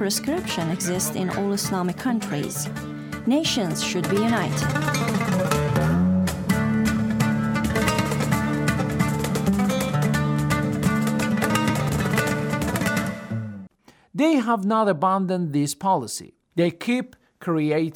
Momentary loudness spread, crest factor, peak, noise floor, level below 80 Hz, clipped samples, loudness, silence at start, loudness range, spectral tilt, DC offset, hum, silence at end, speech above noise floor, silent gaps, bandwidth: 6 LU; 16 dB; -8 dBFS; -52 dBFS; -46 dBFS; under 0.1%; -23 LUFS; 0 s; 2 LU; -5.5 dB/octave; under 0.1%; none; 0 s; 29 dB; none; 19 kHz